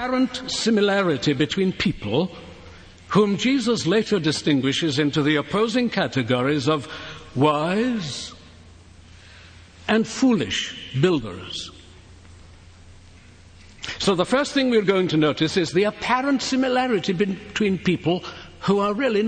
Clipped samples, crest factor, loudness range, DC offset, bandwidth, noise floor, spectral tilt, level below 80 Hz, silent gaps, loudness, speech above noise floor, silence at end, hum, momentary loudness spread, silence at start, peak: under 0.1%; 18 dB; 6 LU; under 0.1%; 9.4 kHz; -47 dBFS; -5 dB/octave; -50 dBFS; none; -22 LUFS; 26 dB; 0 s; none; 11 LU; 0 s; -4 dBFS